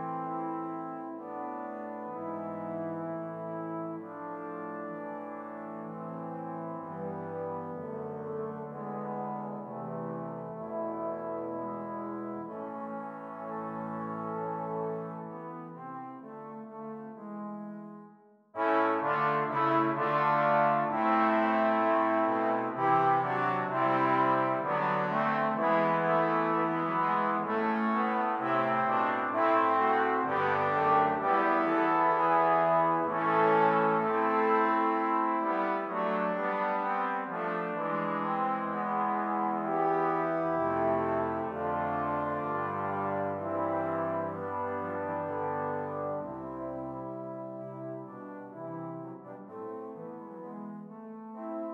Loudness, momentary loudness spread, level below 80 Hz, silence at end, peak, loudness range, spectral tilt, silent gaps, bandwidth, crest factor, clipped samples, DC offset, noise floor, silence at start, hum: -30 LUFS; 16 LU; -74 dBFS; 0 s; -14 dBFS; 13 LU; -8.5 dB/octave; none; 6.6 kHz; 18 dB; under 0.1%; under 0.1%; -57 dBFS; 0 s; none